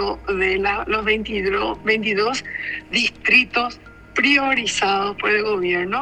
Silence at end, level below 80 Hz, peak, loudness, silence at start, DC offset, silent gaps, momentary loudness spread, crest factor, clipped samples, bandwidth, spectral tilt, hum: 0 s; -44 dBFS; -2 dBFS; -19 LUFS; 0 s; under 0.1%; none; 9 LU; 18 dB; under 0.1%; 11 kHz; -3 dB/octave; none